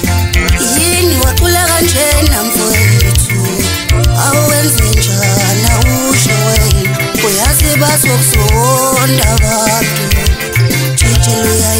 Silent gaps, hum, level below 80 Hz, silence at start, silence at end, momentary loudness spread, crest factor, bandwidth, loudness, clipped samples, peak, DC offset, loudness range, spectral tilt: none; none; -16 dBFS; 0 s; 0 s; 3 LU; 10 dB; 16.5 kHz; -9 LUFS; under 0.1%; 0 dBFS; under 0.1%; 1 LU; -3.5 dB/octave